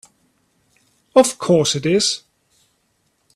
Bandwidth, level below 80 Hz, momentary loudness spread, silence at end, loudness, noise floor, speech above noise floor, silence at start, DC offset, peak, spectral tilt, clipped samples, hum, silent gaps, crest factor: 13.5 kHz; -60 dBFS; 4 LU; 1.2 s; -17 LUFS; -66 dBFS; 50 dB; 1.15 s; under 0.1%; 0 dBFS; -4 dB/octave; under 0.1%; none; none; 20 dB